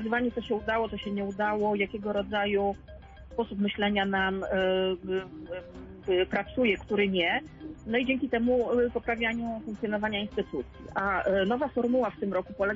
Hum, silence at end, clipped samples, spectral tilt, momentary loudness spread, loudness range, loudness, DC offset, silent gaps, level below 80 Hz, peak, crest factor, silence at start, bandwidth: none; 0 s; under 0.1%; -7 dB/octave; 10 LU; 2 LU; -29 LUFS; under 0.1%; none; -52 dBFS; -14 dBFS; 14 dB; 0 s; 7.6 kHz